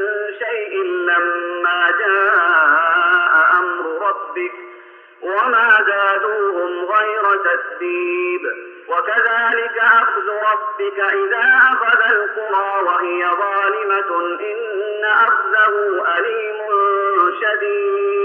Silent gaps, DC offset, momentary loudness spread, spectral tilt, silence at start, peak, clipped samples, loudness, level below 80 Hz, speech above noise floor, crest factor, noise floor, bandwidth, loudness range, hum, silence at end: none; under 0.1%; 10 LU; -3.5 dB/octave; 0 s; -2 dBFS; under 0.1%; -16 LUFS; -78 dBFS; 25 dB; 14 dB; -42 dBFS; 4.5 kHz; 3 LU; none; 0 s